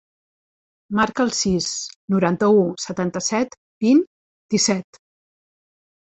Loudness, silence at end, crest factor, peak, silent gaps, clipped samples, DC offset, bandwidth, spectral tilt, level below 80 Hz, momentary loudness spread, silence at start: -20 LUFS; 1.3 s; 18 dB; -4 dBFS; 1.96-2.08 s, 3.57-3.81 s, 4.07-4.49 s; under 0.1%; under 0.1%; 8.4 kHz; -4.5 dB/octave; -54 dBFS; 9 LU; 0.9 s